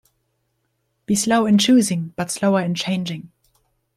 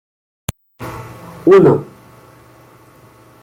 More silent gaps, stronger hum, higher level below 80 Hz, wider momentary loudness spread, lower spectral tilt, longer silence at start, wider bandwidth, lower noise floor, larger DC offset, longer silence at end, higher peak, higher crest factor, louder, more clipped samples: neither; neither; second, -60 dBFS vs -48 dBFS; second, 11 LU vs 24 LU; second, -4.5 dB/octave vs -7.5 dB/octave; first, 1.1 s vs 0.8 s; second, 14 kHz vs 16.5 kHz; first, -71 dBFS vs -45 dBFS; neither; second, 0.7 s vs 1.6 s; second, -6 dBFS vs -2 dBFS; about the same, 16 dB vs 16 dB; second, -19 LUFS vs -11 LUFS; neither